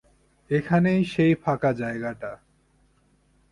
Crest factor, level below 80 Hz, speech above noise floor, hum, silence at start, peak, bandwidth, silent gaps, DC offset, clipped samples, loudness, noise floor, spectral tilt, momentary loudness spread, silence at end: 18 dB; -56 dBFS; 40 dB; none; 0.5 s; -8 dBFS; 11 kHz; none; under 0.1%; under 0.1%; -24 LUFS; -63 dBFS; -8.5 dB/octave; 12 LU; 1.15 s